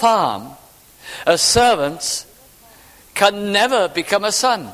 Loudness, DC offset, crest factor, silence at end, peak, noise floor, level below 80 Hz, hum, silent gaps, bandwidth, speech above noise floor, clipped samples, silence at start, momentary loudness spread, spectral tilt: -16 LUFS; under 0.1%; 18 dB; 0 s; 0 dBFS; -46 dBFS; -46 dBFS; none; none; 16 kHz; 30 dB; under 0.1%; 0 s; 12 LU; -2 dB/octave